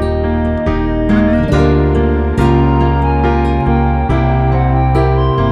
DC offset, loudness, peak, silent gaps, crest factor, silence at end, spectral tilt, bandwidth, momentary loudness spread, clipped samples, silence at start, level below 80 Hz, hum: under 0.1%; -13 LUFS; 0 dBFS; none; 12 dB; 0 s; -9 dB/octave; 7.4 kHz; 4 LU; under 0.1%; 0 s; -18 dBFS; none